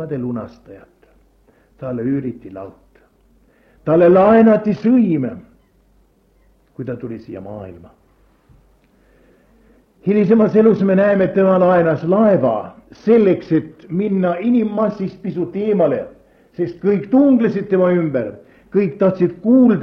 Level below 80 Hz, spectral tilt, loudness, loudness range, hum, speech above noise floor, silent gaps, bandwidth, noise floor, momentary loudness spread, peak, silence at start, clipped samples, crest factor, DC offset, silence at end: -54 dBFS; -10.5 dB/octave; -15 LUFS; 19 LU; none; 40 dB; none; 6 kHz; -55 dBFS; 19 LU; -2 dBFS; 0 s; under 0.1%; 16 dB; under 0.1%; 0 s